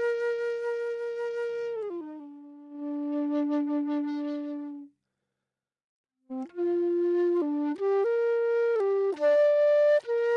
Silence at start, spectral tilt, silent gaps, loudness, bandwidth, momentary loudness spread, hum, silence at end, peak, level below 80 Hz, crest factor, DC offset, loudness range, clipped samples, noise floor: 0 s; -5 dB/octave; 5.84-6.04 s; -27 LUFS; 7 kHz; 17 LU; none; 0 s; -16 dBFS; -90 dBFS; 12 dB; under 0.1%; 8 LU; under 0.1%; -89 dBFS